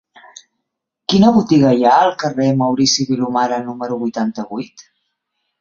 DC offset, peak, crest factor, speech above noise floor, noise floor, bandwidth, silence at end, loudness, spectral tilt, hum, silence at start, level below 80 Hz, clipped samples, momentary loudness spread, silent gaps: under 0.1%; 0 dBFS; 16 dB; 62 dB; -77 dBFS; 7.6 kHz; 0.8 s; -15 LUFS; -5 dB/octave; none; 1.1 s; -54 dBFS; under 0.1%; 14 LU; none